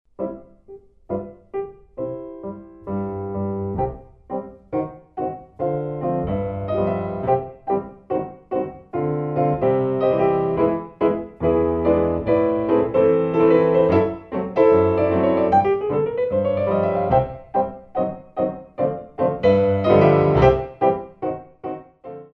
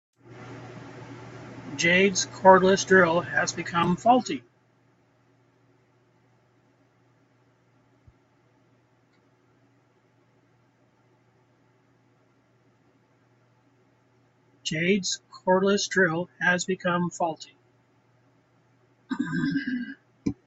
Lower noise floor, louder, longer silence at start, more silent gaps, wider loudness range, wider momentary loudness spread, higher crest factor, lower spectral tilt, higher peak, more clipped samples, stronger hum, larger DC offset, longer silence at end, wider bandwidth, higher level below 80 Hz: second, -45 dBFS vs -64 dBFS; first, -21 LUFS vs -24 LUFS; about the same, 0.2 s vs 0.3 s; neither; about the same, 11 LU vs 11 LU; second, 15 LU vs 24 LU; second, 20 dB vs 26 dB; first, -10 dB/octave vs -4 dB/octave; about the same, -2 dBFS vs -2 dBFS; neither; neither; neither; about the same, 0.1 s vs 0.15 s; second, 6 kHz vs 8.2 kHz; first, -42 dBFS vs -64 dBFS